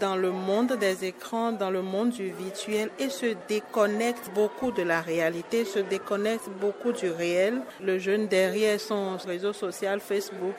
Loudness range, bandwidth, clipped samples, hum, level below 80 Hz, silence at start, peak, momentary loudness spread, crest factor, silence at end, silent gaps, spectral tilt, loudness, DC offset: 2 LU; 16.5 kHz; under 0.1%; none; -70 dBFS; 0 s; -10 dBFS; 6 LU; 18 dB; 0 s; none; -4.5 dB/octave; -28 LUFS; under 0.1%